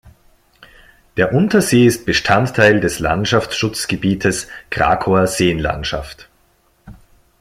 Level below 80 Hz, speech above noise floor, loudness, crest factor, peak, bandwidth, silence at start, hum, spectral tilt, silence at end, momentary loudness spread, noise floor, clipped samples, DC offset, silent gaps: -38 dBFS; 42 dB; -16 LUFS; 16 dB; 0 dBFS; 16 kHz; 0.05 s; none; -5 dB/octave; 0.5 s; 11 LU; -57 dBFS; under 0.1%; under 0.1%; none